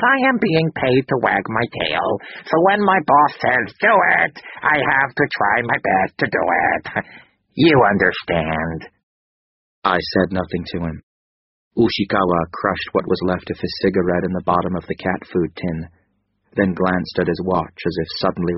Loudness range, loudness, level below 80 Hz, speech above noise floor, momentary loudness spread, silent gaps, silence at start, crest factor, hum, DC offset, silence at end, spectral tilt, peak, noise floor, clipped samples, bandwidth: 6 LU; -18 LUFS; -46 dBFS; 48 dB; 11 LU; 9.03-9.82 s, 11.03-11.71 s; 0 s; 18 dB; none; under 0.1%; 0 s; -4 dB/octave; 0 dBFS; -66 dBFS; under 0.1%; 6 kHz